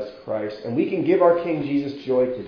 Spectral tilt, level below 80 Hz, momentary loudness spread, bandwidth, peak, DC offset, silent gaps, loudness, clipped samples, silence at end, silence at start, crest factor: -9 dB/octave; -60 dBFS; 11 LU; 5.4 kHz; -4 dBFS; under 0.1%; none; -22 LUFS; under 0.1%; 0 s; 0 s; 18 dB